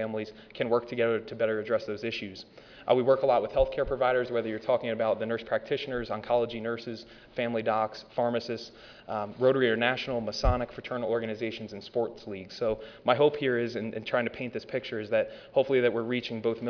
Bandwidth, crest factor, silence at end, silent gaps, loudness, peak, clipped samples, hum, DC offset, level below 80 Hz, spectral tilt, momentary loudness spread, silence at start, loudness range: 5.4 kHz; 20 dB; 0 s; none; -29 LUFS; -8 dBFS; under 0.1%; none; under 0.1%; -46 dBFS; -6.5 dB/octave; 12 LU; 0 s; 3 LU